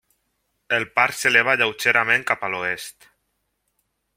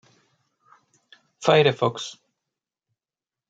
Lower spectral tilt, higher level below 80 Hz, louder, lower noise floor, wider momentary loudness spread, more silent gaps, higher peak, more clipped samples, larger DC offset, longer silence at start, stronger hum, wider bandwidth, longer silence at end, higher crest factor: second, -2.5 dB/octave vs -5 dB/octave; first, -66 dBFS vs -72 dBFS; about the same, -19 LUFS vs -21 LUFS; second, -74 dBFS vs under -90 dBFS; second, 10 LU vs 17 LU; neither; about the same, 0 dBFS vs -2 dBFS; neither; neither; second, 0.7 s vs 1.4 s; neither; first, 16.5 kHz vs 8 kHz; about the same, 1.25 s vs 1.35 s; about the same, 22 dB vs 24 dB